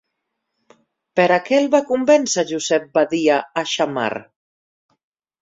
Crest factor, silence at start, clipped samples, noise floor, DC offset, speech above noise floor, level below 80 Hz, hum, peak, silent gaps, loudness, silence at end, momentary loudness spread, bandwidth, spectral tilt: 18 dB; 1.15 s; under 0.1%; -77 dBFS; under 0.1%; 59 dB; -66 dBFS; none; -2 dBFS; none; -18 LUFS; 1.2 s; 8 LU; 7.8 kHz; -3.5 dB/octave